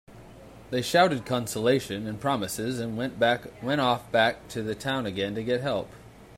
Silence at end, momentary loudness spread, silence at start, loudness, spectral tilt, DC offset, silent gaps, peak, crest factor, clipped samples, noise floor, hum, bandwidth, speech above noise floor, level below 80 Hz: 0 s; 9 LU; 0.1 s; -27 LUFS; -4.5 dB/octave; under 0.1%; none; -8 dBFS; 20 dB; under 0.1%; -48 dBFS; none; 16 kHz; 21 dB; -58 dBFS